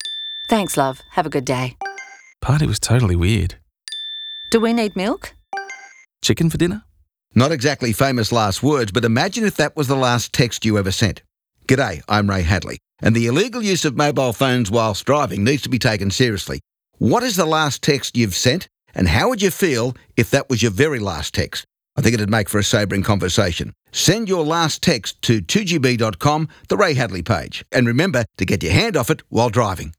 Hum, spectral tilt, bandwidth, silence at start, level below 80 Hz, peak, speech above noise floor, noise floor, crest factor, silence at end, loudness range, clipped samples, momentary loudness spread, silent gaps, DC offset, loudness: none; -5 dB/octave; 18 kHz; 0 s; -42 dBFS; -2 dBFS; 25 dB; -43 dBFS; 16 dB; 0.05 s; 3 LU; under 0.1%; 10 LU; none; under 0.1%; -18 LUFS